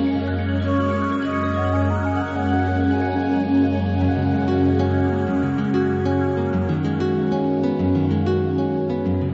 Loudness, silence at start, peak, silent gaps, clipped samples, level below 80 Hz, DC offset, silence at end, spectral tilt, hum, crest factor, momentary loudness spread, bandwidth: -21 LUFS; 0 s; -6 dBFS; none; under 0.1%; -34 dBFS; under 0.1%; 0 s; -9 dB/octave; none; 14 dB; 3 LU; 7.6 kHz